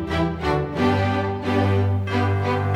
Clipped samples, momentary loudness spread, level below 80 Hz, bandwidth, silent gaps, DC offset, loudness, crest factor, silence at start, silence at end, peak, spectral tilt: under 0.1%; 3 LU; -40 dBFS; 8.4 kHz; none; under 0.1%; -22 LUFS; 14 dB; 0 s; 0 s; -8 dBFS; -7.5 dB/octave